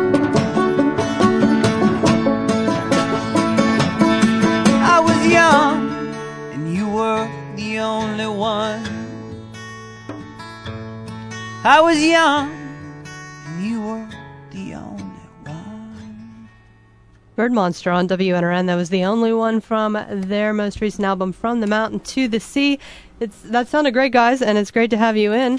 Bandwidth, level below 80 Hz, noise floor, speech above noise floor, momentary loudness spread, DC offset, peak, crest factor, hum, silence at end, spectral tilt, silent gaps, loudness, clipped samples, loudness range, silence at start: 11 kHz; -50 dBFS; -49 dBFS; 32 dB; 21 LU; under 0.1%; 0 dBFS; 18 dB; none; 0 s; -5.5 dB/octave; none; -17 LUFS; under 0.1%; 14 LU; 0 s